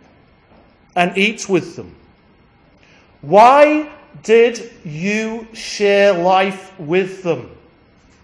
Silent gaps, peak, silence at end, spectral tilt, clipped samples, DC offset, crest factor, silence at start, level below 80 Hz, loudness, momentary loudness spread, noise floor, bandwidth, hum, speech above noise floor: none; 0 dBFS; 0.75 s; -5 dB/octave; under 0.1%; under 0.1%; 16 dB; 0.95 s; -58 dBFS; -15 LUFS; 21 LU; -51 dBFS; 10.5 kHz; none; 36 dB